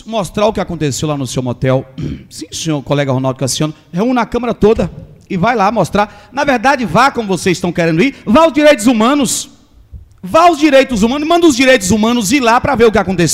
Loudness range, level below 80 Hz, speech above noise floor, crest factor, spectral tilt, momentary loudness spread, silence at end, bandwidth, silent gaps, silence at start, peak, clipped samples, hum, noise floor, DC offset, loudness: 6 LU; -36 dBFS; 24 dB; 12 dB; -5 dB/octave; 10 LU; 0 s; 16 kHz; none; 0.05 s; 0 dBFS; under 0.1%; none; -36 dBFS; under 0.1%; -12 LUFS